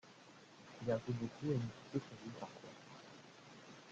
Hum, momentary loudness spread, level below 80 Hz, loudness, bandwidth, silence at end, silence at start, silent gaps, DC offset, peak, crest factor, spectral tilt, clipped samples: none; 19 LU; -76 dBFS; -43 LUFS; 8.6 kHz; 0 s; 0.05 s; none; under 0.1%; -26 dBFS; 20 dB; -7 dB/octave; under 0.1%